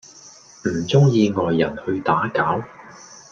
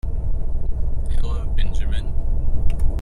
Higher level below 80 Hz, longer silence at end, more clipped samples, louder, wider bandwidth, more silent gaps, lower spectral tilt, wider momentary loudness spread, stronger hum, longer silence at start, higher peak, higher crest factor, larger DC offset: second, -56 dBFS vs -20 dBFS; about the same, 0.1 s vs 0 s; neither; first, -20 LUFS vs -27 LUFS; first, 7.4 kHz vs 4.2 kHz; neither; about the same, -6.5 dB/octave vs -7 dB/octave; first, 12 LU vs 3 LU; neither; first, 0.25 s vs 0.05 s; about the same, -2 dBFS vs -4 dBFS; first, 18 dB vs 12 dB; neither